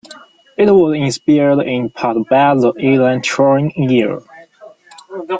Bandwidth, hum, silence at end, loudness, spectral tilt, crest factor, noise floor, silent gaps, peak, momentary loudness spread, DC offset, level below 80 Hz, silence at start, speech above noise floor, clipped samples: 9.2 kHz; none; 0 s; -13 LUFS; -6.5 dB/octave; 12 dB; -41 dBFS; none; -2 dBFS; 10 LU; under 0.1%; -56 dBFS; 0.1 s; 28 dB; under 0.1%